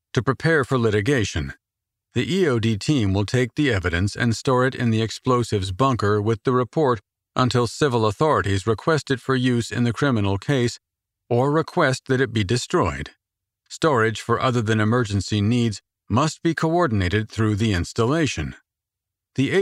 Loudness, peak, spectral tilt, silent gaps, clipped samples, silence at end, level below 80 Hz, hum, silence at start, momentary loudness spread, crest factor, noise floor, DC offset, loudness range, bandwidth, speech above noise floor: -21 LUFS; -4 dBFS; -6 dB/octave; none; under 0.1%; 0 s; -46 dBFS; none; 0.15 s; 5 LU; 16 dB; -86 dBFS; under 0.1%; 1 LU; 12.5 kHz; 65 dB